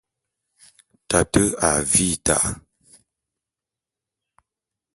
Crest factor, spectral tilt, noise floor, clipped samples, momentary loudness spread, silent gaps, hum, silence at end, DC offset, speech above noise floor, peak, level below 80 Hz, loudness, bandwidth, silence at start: 24 dB; -3.5 dB/octave; -88 dBFS; under 0.1%; 6 LU; none; none; 2.35 s; under 0.1%; 68 dB; 0 dBFS; -44 dBFS; -19 LUFS; 12 kHz; 1.1 s